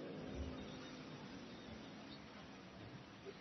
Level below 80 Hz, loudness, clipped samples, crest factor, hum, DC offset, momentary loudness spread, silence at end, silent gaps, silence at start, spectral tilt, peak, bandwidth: -62 dBFS; -53 LUFS; under 0.1%; 16 dB; none; under 0.1%; 7 LU; 0 s; none; 0 s; -4.5 dB/octave; -38 dBFS; 6.2 kHz